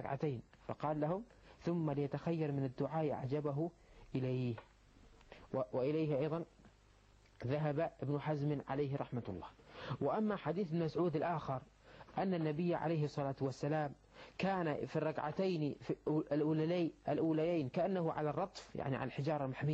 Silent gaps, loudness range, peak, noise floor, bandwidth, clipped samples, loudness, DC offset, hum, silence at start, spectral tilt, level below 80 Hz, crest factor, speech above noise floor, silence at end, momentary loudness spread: none; 4 LU; -24 dBFS; -66 dBFS; 8 kHz; under 0.1%; -39 LUFS; under 0.1%; none; 0 s; -8.5 dB/octave; -68 dBFS; 14 dB; 28 dB; 0 s; 9 LU